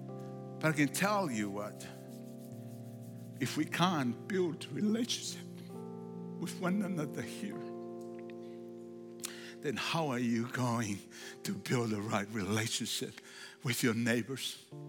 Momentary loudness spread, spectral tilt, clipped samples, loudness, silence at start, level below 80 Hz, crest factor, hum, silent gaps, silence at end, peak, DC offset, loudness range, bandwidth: 16 LU; -4.5 dB/octave; under 0.1%; -36 LUFS; 0 s; -86 dBFS; 22 dB; none; none; 0 s; -14 dBFS; under 0.1%; 5 LU; 17.5 kHz